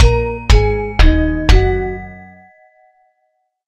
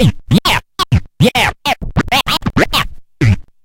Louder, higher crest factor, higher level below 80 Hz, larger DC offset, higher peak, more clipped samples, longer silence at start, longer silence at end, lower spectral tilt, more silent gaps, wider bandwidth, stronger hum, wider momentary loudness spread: about the same, -15 LUFS vs -14 LUFS; about the same, 14 dB vs 14 dB; first, -16 dBFS vs -28 dBFS; neither; about the same, 0 dBFS vs 0 dBFS; neither; about the same, 0 s vs 0 s; first, 1.45 s vs 0.25 s; about the same, -6 dB/octave vs -5 dB/octave; neither; second, 9 kHz vs 17 kHz; neither; first, 11 LU vs 5 LU